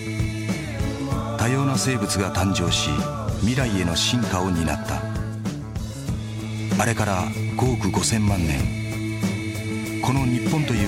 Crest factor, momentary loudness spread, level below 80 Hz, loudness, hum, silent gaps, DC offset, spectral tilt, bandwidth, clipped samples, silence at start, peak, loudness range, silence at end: 16 dB; 8 LU; -36 dBFS; -23 LUFS; none; none; under 0.1%; -5 dB/octave; 16 kHz; under 0.1%; 0 s; -8 dBFS; 3 LU; 0 s